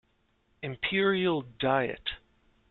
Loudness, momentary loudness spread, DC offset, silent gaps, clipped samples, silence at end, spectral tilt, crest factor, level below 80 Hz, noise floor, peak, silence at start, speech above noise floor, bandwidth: -29 LUFS; 14 LU; under 0.1%; none; under 0.1%; 0.55 s; -3 dB/octave; 18 dB; -58 dBFS; -71 dBFS; -12 dBFS; 0.6 s; 42 dB; 4.4 kHz